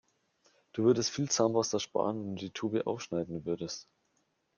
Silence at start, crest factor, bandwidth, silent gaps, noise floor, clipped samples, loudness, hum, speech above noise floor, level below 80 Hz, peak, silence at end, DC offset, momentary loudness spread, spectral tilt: 0.75 s; 20 dB; 10 kHz; none; -76 dBFS; under 0.1%; -32 LUFS; none; 45 dB; -72 dBFS; -14 dBFS; 0.75 s; under 0.1%; 11 LU; -4.5 dB/octave